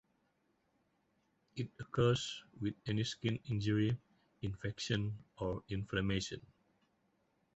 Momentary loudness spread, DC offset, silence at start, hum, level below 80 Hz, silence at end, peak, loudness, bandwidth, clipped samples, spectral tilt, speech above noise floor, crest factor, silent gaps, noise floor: 11 LU; under 0.1%; 1.55 s; none; -60 dBFS; 1.15 s; -18 dBFS; -38 LUFS; 8 kHz; under 0.1%; -5.5 dB/octave; 41 dB; 20 dB; none; -79 dBFS